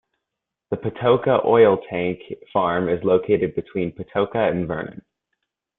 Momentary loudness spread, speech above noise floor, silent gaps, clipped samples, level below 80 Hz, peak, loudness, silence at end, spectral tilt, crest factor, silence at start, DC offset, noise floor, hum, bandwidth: 12 LU; 63 dB; none; under 0.1%; -56 dBFS; -2 dBFS; -21 LUFS; 0.85 s; -11 dB/octave; 18 dB; 0.7 s; under 0.1%; -83 dBFS; none; 4 kHz